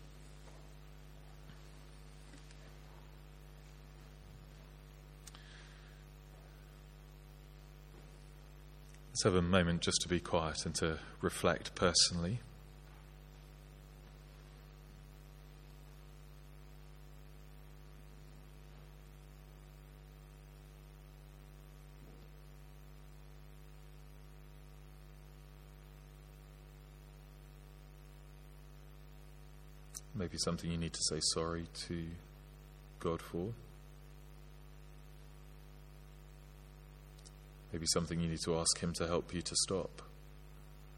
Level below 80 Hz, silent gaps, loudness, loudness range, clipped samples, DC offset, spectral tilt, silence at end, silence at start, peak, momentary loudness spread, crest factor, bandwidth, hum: -56 dBFS; none; -36 LUFS; 22 LU; under 0.1%; under 0.1%; -3.5 dB/octave; 0 s; 0 s; -14 dBFS; 23 LU; 30 dB; 16.5 kHz; 50 Hz at -55 dBFS